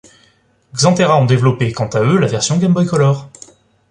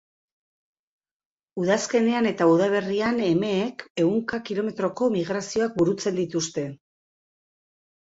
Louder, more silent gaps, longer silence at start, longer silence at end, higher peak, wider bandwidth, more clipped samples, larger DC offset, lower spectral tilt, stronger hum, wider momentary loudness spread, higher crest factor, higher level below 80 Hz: first, -14 LUFS vs -24 LUFS; second, none vs 3.90-3.95 s; second, 0.75 s vs 1.55 s; second, 0.65 s vs 1.35 s; first, 0 dBFS vs -8 dBFS; first, 10.5 kHz vs 8 kHz; neither; neither; about the same, -5.5 dB/octave vs -5 dB/octave; neither; about the same, 6 LU vs 8 LU; about the same, 14 dB vs 18 dB; first, -50 dBFS vs -64 dBFS